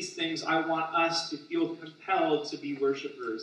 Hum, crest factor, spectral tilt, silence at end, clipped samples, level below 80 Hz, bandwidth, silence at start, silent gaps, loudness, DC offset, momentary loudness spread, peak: none; 16 dB; -3.5 dB/octave; 0 s; under 0.1%; -88 dBFS; 10.5 kHz; 0 s; none; -30 LUFS; under 0.1%; 8 LU; -14 dBFS